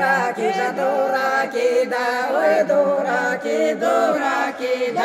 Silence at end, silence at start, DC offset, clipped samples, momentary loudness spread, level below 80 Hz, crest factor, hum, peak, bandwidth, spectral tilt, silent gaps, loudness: 0 s; 0 s; under 0.1%; under 0.1%; 4 LU; -72 dBFS; 14 dB; none; -6 dBFS; 15.5 kHz; -4 dB/octave; none; -19 LUFS